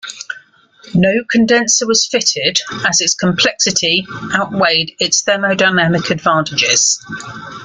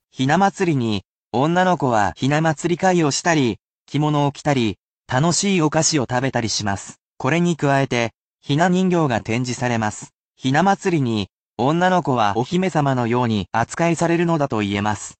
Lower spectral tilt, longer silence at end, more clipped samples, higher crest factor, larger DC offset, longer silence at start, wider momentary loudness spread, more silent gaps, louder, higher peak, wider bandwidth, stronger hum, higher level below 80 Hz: second, -2.5 dB/octave vs -5 dB/octave; about the same, 0 s vs 0.05 s; neither; about the same, 14 dB vs 16 dB; neither; second, 0.05 s vs 0.2 s; about the same, 8 LU vs 9 LU; second, none vs 1.05-1.31 s, 3.61-3.86 s, 4.80-4.97 s, 7.02-7.15 s, 8.18-8.35 s, 10.14-10.34 s, 11.32-11.56 s; first, -13 LUFS vs -19 LUFS; first, 0 dBFS vs -4 dBFS; first, 11 kHz vs 9 kHz; neither; about the same, -52 dBFS vs -54 dBFS